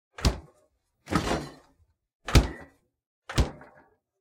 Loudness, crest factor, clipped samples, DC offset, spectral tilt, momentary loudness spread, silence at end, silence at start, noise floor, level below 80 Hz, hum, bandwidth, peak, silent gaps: -28 LUFS; 26 dB; under 0.1%; under 0.1%; -5 dB/octave; 21 LU; 0.65 s; 0.2 s; -69 dBFS; -34 dBFS; none; 16.5 kHz; -4 dBFS; 2.15-2.20 s, 3.06-3.22 s